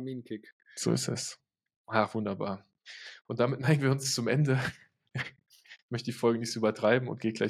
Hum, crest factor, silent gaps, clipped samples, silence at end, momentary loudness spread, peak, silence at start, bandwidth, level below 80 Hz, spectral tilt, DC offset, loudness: none; 22 dB; 0.53-0.60 s, 1.76-1.84 s, 5.82-5.89 s; under 0.1%; 0 s; 17 LU; -10 dBFS; 0 s; 14.5 kHz; -70 dBFS; -5 dB/octave; under 0.1%; -31 LUFS